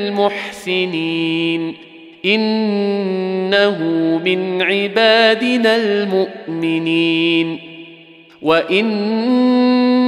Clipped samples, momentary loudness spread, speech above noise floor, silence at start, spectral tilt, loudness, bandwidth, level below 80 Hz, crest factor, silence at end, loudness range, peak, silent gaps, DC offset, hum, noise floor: under 0.1%; 9 LU; 27 dB; 0 s; -6 dB/octave; -16 LUFS; 12 kHz; -64 dBFS; 14 dB; 0 s; 3 LU; -2 dBFS; none; under 0.1%; none; -42 dBFS